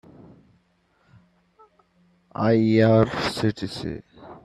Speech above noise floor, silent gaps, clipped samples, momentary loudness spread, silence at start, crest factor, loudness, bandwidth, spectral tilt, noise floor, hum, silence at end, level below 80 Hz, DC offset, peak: 45 dB; none; under 0.1%; 17 LU; 2.4 s; 20 dB; -22 LUFS; 12.5 kHz; -7 dB/octave; -65 dBFS; none; 0.05 s; -54 dBFS; under 0.1%; -4 dBFS